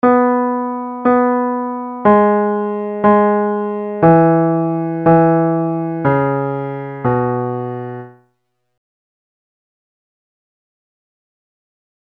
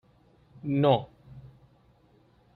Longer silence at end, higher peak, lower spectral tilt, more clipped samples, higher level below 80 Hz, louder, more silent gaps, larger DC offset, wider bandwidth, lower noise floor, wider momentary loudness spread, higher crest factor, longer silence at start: first, 3.95 s vs 1.1 s; first, 0 dBFS vs -10 dBFS; first, -11.5 dB/octave vs -10 dB/octave; neither; first, -50 dBFS vs -64 dBFS; first, -15 LUFS vs -27 LUFS; neither; neither; second, 3.8 kHz vs 4.7 kHz; first, -69 dBFS vs -62 dBFS; second, 11 LU vs 27 LU; second, 16 dB vs 22 dB; second, 0.05 s vs 0.65 s